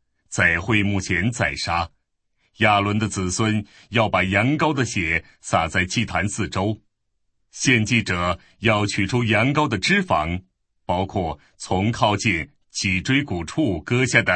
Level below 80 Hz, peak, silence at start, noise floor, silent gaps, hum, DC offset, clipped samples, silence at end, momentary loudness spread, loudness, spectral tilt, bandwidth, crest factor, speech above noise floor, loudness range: -46 dBFS; 0 dBFS; 0.3 s; -71 dBFS; none; none; under 0.1%; under 0.1%; 0 s; 9 LU; -21 LUFS; -4.5 dB/octave; 8.8 kHz; 20 dB; 50 dB; 2 LU